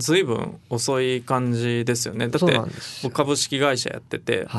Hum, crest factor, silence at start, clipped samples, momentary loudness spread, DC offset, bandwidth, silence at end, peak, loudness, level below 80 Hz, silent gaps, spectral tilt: none; 20 dB; 0 s; under 0.1%; 8 LU; under 0.1%; 12 kHz; 0 s; -4 dBFS; -23 LUFS; -60 dBFS; none; -4.5 dB/octave